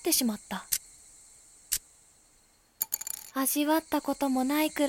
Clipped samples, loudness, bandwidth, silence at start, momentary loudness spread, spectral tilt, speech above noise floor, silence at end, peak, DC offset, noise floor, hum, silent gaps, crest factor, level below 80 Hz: under 0.1%; -30 LUFS; 17 kHz; 0 s; 8 LU; -2 dB/octave; 36 dB; 0 s; -8 dBFS; under 0.1%; -64 dBFS; none; none; 24 dB; -64 dBFS